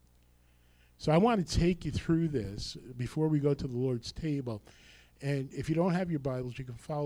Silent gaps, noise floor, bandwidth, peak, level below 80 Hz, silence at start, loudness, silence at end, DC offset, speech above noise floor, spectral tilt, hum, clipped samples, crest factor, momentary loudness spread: none; -64 dBFS; 12.5 kHz; -14 dBFS; -48 dBFS; 1 s; -32 LUFS; 0 s; under 0.1%; 32 dB; -7 dB/octave; 60 Hz at -55 dBFS; under 0.1%; 18 dB; 13 LU